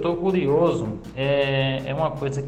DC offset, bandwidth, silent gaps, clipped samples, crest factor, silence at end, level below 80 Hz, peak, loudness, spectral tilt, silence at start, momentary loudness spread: under 0.1%; 9 kHz; none; under 0.1%; 14 dB; 0 s; -46 dBFS; -8 dBFS; -23 LUFS; -7 dB/octave; 0 s; 7 LU